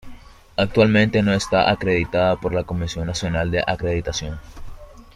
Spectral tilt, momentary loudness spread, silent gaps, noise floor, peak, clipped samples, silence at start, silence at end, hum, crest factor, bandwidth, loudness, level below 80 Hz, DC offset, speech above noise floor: -5.5 dB/octave; 11 LU; none; -40 dBFS; -2 dBFS; under 0.1%; 0.05 s; 0.15 s; none; 18 dB; 12 kHz; -20 LUFS; -38 dBFS; under 0.1%; 20 dB